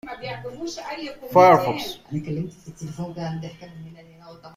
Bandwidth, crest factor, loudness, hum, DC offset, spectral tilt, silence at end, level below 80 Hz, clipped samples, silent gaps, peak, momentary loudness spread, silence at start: 16 kHz; 22 dB; -22 LUFS; none; under 0.1%; -6 dB/octave; 0.05 s; -58 dBFS; under 0.1%; none; -2 dBFS; 24 LU; 0.05 s